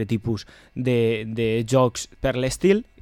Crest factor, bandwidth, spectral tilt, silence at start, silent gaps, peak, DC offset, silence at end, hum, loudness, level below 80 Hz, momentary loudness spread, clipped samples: 16 dB; 17 kHz; -6 dB/octave; 0 s; none; -6 dBFS; under 0.1%; 0.2 s; none; -23 LUFS; -44 dBFS; 9 LU; under 0.1%